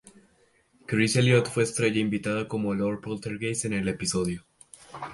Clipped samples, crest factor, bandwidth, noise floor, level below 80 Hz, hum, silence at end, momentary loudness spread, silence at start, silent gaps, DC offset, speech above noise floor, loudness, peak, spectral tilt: under 0.1%; 20 dB; 11.5 kHz; -64 dBFS; -56 dBFS; none; 0 s; 12 LU; 0.9 s; none; under 0.1%; 38 dB; -26 LUFS; -8 dBFS; -5 dB/octave